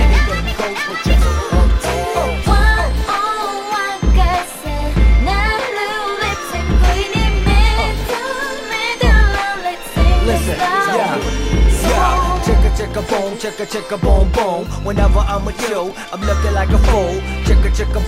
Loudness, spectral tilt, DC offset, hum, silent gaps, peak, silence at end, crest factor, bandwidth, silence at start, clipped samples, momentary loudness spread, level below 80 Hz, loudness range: -16 LUFS; -5 dB/octave; under 0.1%; none; none; 0 dBFS; 0 s; 14 dB; 15 kHz; 0 s; under 0.1%; 7 LU; -16 dBFS; 2 LU